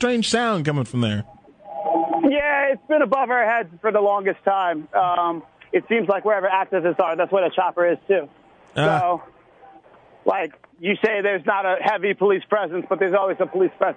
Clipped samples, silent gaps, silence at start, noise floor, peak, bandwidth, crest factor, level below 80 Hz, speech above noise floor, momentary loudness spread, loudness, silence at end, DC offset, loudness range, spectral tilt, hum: under 0.1%; none; 0 s; -50 dBFS; -2 dBFS; 10 kHz; 18 dB; -62 dBFS; 29 dB; 6 LU; -21 LUFS; 0 s; under 0.1%; 3 LU; -5.5 dB/octave; none